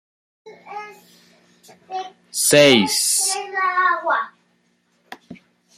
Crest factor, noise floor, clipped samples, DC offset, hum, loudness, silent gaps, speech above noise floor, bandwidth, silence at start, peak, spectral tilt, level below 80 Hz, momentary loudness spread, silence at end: 20 dB; -64 dBFS; under 0.1%; under 0.1%; none; -16 LUFS; none; 48 dB; 16 kHz; 0.45 s; 0 dBFS; -2 dB/octave; -66 dBFS; 23 LU; 0.4 s